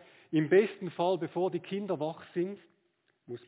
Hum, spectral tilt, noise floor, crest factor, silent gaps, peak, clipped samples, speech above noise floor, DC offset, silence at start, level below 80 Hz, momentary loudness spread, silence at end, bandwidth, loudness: none; -6 dB/octave; -75 dBFS; 18 dB; none; -14 dBFS; under 0.1%; 45 dB; under 0.1%; 0.3 s; -84 dBFS; 11 LU; 0.1 s; 4 kHz; -31 LUFS